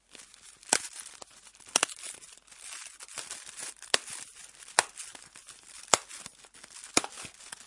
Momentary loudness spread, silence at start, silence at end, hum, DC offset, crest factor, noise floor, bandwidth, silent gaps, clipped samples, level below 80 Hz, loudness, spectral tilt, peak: 21 LU; 0.15 s; 0 s; none; under 0.1%; 36 dB; -54 dBFS; 12 kHz; none; under 0.1%; -70 dBFS; -31 LUFS; 0.5 dB/octave; 0 dBFS